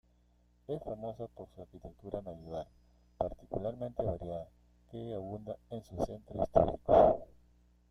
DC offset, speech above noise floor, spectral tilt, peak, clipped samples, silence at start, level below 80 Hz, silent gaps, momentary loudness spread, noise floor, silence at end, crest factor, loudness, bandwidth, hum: under 0.1%; 34 dB; -8.5 dB/octave; -10 dBFS; under 0.1%; 0.7 s; -54 dBFS; none; 23 LU; -68 dBFS; 0.65 s; 26 dB; -35 LUFS; 11 kHz; 60 Hz at -60 dBFS